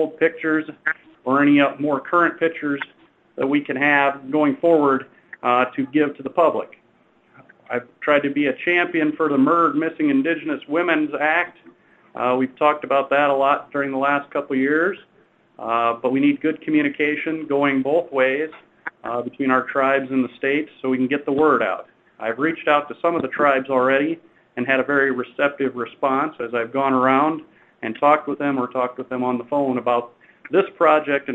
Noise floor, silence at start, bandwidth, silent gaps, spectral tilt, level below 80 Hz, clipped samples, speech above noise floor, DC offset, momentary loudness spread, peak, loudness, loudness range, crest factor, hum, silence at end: -58 dBFS; 0 s; 4 kHz; none; -7.5 dB/octave; -68 dBFS; under 0.1%; 38 dB; under 0.1%; 10 LU; 0 dBFS; -20 LUFS; 2 LU; 20 dB; none; 0 s